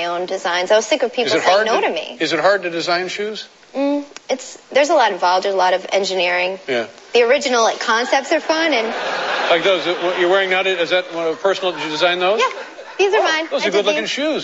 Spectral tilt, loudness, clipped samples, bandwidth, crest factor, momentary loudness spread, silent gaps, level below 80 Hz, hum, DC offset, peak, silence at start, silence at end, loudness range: -2.5 dB/octave; -17 LUFS; under 0.1%; 8.2 kHz; 18 dB; 8 LU; none; -74 dBFS; none; under 0.1%; 0 dBFS; 0 s; 0 s; 2 LU